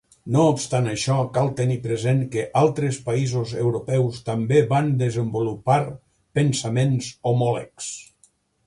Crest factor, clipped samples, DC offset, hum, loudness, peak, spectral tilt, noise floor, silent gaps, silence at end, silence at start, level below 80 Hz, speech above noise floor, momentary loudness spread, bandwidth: 16 dB; under 0.1%; under 0.1%; none; -22 LUFS; -6 dBFS; -6.5 dB/octave; -61 dBFS; none; 0.65 s; 0.25 s; -56 dBFS; 40 dB; 6 LU; 11.5 kHz